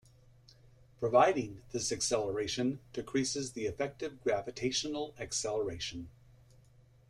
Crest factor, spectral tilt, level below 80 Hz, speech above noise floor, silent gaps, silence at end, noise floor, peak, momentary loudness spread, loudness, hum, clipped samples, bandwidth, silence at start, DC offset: 22 dB; -3.5 dB/octave; -62 dBFS; 28 dB; none; 1 s; -62 dBFS; -12 dBFS; 11 LU; -34 LUFS; none; under 0.1%; 14 kHz; 1 s; under 0.1%